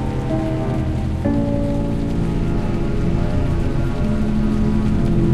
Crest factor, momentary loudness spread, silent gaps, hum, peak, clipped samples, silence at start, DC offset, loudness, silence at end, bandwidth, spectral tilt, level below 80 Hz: 12 dB; 3 LU; none; none; -6 dBFS; under 0.1%; 0 s; under 0.1%; -20 LUFS; 0 s; 11 kHz; -8.5 dB/octave; -24 dBFS